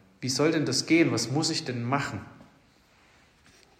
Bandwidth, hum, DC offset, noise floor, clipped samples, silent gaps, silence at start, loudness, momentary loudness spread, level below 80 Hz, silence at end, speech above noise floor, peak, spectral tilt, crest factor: 15 kHz; none; under 0.1%; -61 dBFS; under 0.1%; none; 0.2 s; -26 LUFS; 8 LU; -68 dBFS; 1.35 s; 34 dB; -12 dBFS; -4 dB/octave; 18 dB